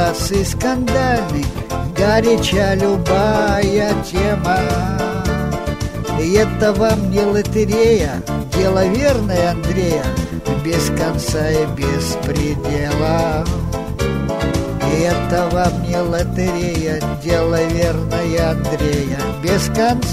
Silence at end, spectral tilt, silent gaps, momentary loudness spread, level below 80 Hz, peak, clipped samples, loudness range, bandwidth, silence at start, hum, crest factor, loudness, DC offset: 0 s; -5.5 dB/octave; none; 6 LU; -28 dBFS; 0 dBFS; under 0.1%; 3 LU; 16 kHz; 0 s; none; 16 dB; -17 LUFS; under 0.1%